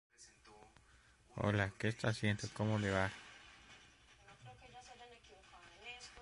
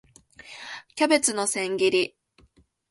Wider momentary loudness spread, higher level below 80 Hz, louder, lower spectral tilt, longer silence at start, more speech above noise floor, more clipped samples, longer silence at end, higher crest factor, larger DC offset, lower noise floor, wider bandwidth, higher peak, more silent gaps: first, 24 LU vs 18 LU; about the same, -62 dBFS vs -66 dBFS; second, -39 LUFS vs -23 LUFS; first, -5.5 dB/octave vs -2 dB/octave; second, 0.2 s vs 0.45 s; second, 30 dB vs 38 dB; neither; second, 0 s vs 0.8 s; about the same, 22 dB vs 22 dB; neither; first, -67 dBFS vs -61 dBFS; about the same, 11.5 kHz vs 11.5 kHz; second, -20 dBFS vs -6 dBFS; neither